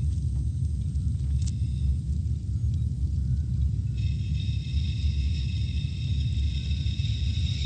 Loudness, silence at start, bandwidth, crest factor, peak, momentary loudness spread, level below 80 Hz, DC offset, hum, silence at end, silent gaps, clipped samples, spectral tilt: -29 LUFS; 0 s; 9 kHz; 10 dB; -16 dBFS; 2 LU; -30 dBFS; under 0.1%; none; 0 s; none; under 0.1%; -6.5 dB/octave